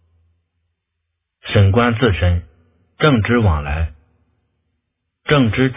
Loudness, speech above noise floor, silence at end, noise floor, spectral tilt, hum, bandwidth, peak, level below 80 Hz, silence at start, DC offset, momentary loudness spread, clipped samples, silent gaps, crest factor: -16 LUFS; 61 dB; 0 s; -75 dBFS; -11 dB/octave; none; 3.9 kHz; 0 dBFS; -28 dBFS; 1.45 s; under 0.1%; 10 LU; under 0.1%; none; 18 dB